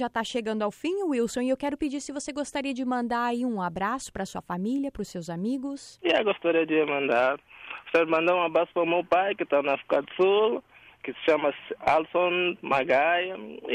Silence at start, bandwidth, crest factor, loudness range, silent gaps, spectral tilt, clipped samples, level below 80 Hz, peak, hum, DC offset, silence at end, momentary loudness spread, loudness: 0 s; 14.5 kHz; 14 dB; 5 LU; none; -4.5 dB/octave; under 0.1%; -60 dBFS; -12 dBFS; none; under 0.1%; 0 s; 10 LU; -26 LUFS